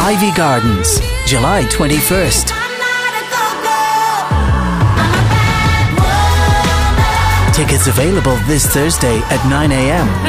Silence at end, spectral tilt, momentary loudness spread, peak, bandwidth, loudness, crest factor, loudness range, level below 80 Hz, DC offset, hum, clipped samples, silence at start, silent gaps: 0 s; -4.5 dB/octave; 3 LU; -2 dBFS; 16 kHz; -12 LUFS; 10 dB; 2 LU; -20 dBFS; under 0.1%; none; under 0.1%; 0 s; none